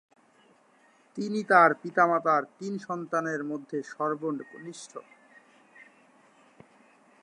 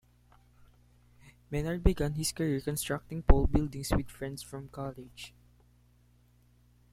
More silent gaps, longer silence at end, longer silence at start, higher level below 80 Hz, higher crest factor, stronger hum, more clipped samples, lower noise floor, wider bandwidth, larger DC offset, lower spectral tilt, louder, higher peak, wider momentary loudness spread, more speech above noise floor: neither; first, 2.2 s vs 1.65 s; about the same, 1.15 s vs 1.25 s; second, -86 dBFS vs -36 dBFS; about the same, 22 dB vs 26 dB; second, none vs 60 Hz at -50 dBFS; neither; about the same, -62 dBFS vs -64 dBFS; second, 11 kHz vs 16 kHz; neither; about the same, -5.5 dB/octave vs -5.5 dB/octave; first, -27 LUFS vs -32 LUFS; about the same, -8 dBFS vs -6 dBFS; first, 22 LU vs 15 LU; about the same, 35 dB vs 34 dB